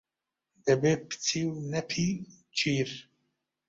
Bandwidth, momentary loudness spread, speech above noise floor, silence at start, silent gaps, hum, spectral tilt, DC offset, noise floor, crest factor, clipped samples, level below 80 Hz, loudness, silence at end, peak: 8 kHz; 9 LU; 59 dB; 0.65 s; none; none; -4.5 dB/octave; under 0.1%; -88 dBFS; 20 dB; under 0.1%; -64 dBFS; -30 LUFS; 0.7 s; -12 dBFS